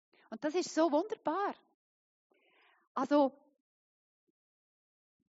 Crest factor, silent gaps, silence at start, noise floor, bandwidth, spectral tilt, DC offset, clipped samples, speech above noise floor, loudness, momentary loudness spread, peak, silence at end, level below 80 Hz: 20 dB; 1.74-2.30 s, 2.87-2.95 s; 0.3 s; -69 dBFS; 7.6 kHz; -2.5 dB/octave; under 0.1%; under 0.1%; 37 dB; -33 LUFS; 13 LU; -18 dBFS; 2.05 s; under -90 dBFS